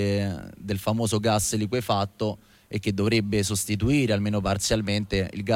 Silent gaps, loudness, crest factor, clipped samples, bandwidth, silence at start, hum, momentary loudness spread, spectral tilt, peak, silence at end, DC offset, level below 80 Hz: none; -25 LUFS; 16 dB; under 0.1%; 16.5 kHz; 0 s; none; 8 LU; -5 dB/octave; -10 dBFS; 0 s; under 0.1%; -44 dBFS